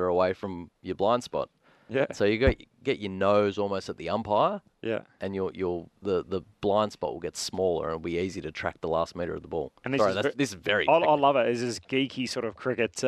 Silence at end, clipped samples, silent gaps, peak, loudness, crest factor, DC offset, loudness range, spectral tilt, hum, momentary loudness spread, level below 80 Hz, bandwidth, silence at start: 0 s; under 0.1%; none; -10 dBFS; -28 LUFS; 18 dB; under 0.1%; 4 LU; -5 dB/octave; none; 10 LU; -48 dBFS; 13.5 kHz; 0 s